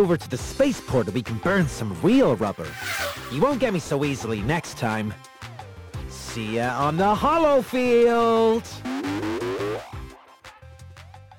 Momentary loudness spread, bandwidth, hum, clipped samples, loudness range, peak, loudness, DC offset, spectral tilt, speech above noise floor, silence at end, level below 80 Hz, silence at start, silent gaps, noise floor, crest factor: 18 LU; over 20 kHz; none; under 0.1%; 5 LU; -8 dBFS; -23 LUFS; under 0.1%; -6 dB/octave; 25 dB; 0.05 s; -46 dBFS; 0 s; none; -47 dBFS; 14 dB